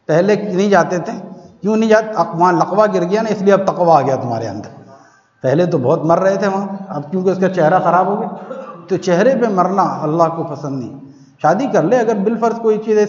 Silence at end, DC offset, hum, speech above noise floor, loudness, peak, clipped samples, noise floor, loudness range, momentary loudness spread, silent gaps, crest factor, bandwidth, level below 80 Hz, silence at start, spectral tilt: 0 s; under 0.1%; none; 32 dB; -15 LUFS; 0 dBFS; under 0.1%; -46 dBFS; 3 LU; 12 LU; none; 14 dB; 7.6 kHz; -64 dBFS; 0.1 s; -7 dB/octave